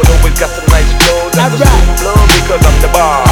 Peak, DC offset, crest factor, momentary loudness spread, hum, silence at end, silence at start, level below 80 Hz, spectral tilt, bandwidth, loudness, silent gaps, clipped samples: 0 dBFS; under 0.1%; 6 dB; 3 LU; none; 0 s; 0 s; -10 dBFS; -4.5 dB/octave; 19 kHz; -9 LUFS; none; 0.5%